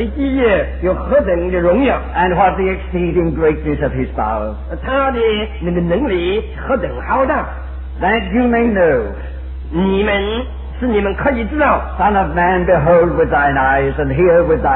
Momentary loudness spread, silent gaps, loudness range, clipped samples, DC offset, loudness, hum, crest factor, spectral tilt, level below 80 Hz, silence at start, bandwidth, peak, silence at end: 8 LU; none; 4 LU; under 0.1%; under 0.1%; -15 LUFS; none; 14 dB; -11 dB/octave; -26 dBFS; 0 s; 4.1 kHz; -2 dBFS; 0 s